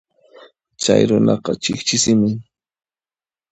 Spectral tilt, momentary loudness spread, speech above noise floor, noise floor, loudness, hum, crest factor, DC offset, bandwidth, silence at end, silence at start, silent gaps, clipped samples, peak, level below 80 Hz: -4.5 dB/octave; 8 LU; over 74 dB; under -90 dBFS; -17 LUFS; none; 20 dB; under 0.1%; 8.8 kHz; 1.1 s; 0.8 s; none; under 0.1%; 0 dBFS; -54 dBFS